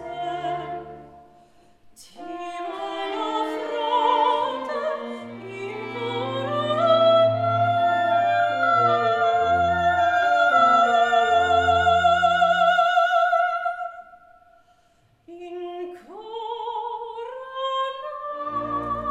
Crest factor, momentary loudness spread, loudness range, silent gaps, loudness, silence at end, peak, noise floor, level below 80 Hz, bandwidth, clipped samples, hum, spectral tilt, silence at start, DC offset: 16 dB; 16 LU; 14 LU; none; -21 LUFS; 0 s; -6 dBFS; -61 dBFS; -60 dBFS; 8.6 kHz; under 0.1%; none; -5 dB/octave; 0 s; under 0.1%